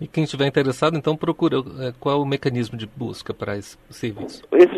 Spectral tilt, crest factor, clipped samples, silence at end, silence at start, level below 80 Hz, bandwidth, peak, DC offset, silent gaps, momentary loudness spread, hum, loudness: -6.5 dB/octave; 20 dB; under 0.1%; 0 s; 0 s; -56 dBFS; 12.5 kHz; -2 dBFS; under 0.1%; none; 11 LU; none; -23 LUFS